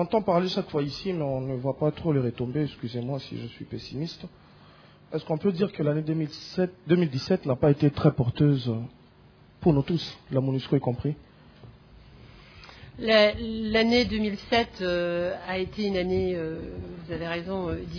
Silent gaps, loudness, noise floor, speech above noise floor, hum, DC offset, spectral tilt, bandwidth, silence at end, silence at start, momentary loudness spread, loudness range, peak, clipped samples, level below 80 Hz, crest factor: none; -27 LUFS; -55 dBFS; 28 dB; none; under 0.1%; -7.5 dB/octave; 5.4 kHz; 0 s; 0 s; 14 LU; 6 LU; -6 dBFS; under 0.1%; -50 dBFS; 22 dB